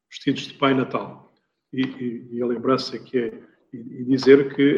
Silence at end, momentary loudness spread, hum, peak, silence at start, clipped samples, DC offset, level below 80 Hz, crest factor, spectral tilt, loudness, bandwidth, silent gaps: 0 s; 18 LU; none; -2 dBFS; 0.1 s; under 0.1%; under 0.1%; -68 dBFS; 22 dB; -6.5 dB/octave; -22 LUFS; 7.4 kHz; none